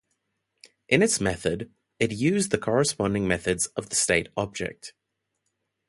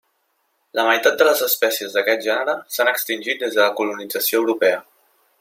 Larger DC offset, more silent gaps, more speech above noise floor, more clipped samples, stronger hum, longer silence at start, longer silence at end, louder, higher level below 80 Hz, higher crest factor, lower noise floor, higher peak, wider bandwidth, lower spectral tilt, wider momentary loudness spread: neither; neither; first, 55 dB vs 49 dB; neither; neither; first, 0.9 s vs 0.75 s; first, 1 s vs 0.6 s; second, -25 LUFS vs -19 LUFS; first, -52 dBFS vs -74 dBFS; about the same, 22 dB vs 18 dB; first, -81 dBFS vs -68 dBFS; about the same, -4 dBFS vs -2 dBFS; second, 11.5 kHz vs 16.5 kHz; first, -4 dB/octave vs -1 dB/octave; first, 12 LU vs 7 LU